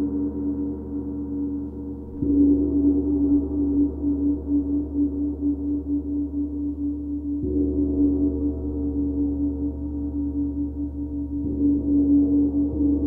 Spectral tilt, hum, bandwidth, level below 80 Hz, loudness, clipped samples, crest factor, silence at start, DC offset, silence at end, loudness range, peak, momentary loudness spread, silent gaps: -14 dB/octave; none; 1.4 kHz; -34 dBFS; -24 LUFS; under 0.1%; 14 dB; 0 s; under 0.1%; 0 s; 4 LU; -10 dBFS; 10 LU; none